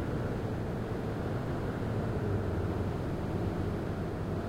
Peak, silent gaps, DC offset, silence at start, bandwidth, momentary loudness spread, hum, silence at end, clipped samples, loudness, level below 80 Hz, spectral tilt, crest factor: -20 dBFS; none; under 0.1%; 0 s; 16 kHz; 3 LU; none; 0 s; under 0.1%; -35 LUFS; -44 dBFS; -8.5 dB/octave; 12 dB